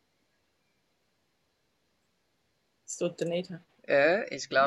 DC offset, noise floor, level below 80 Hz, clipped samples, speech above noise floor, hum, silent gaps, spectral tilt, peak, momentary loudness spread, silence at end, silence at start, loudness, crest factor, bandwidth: under 0.1%; -75 dBFS; -80 dBFS; under 0.1%; 48 dB; none; none; -4 dB/octave; -12 dBFS; 18 LU; 0 s; 2.9 s; -29 LUFS; 22 dB; 12 kHz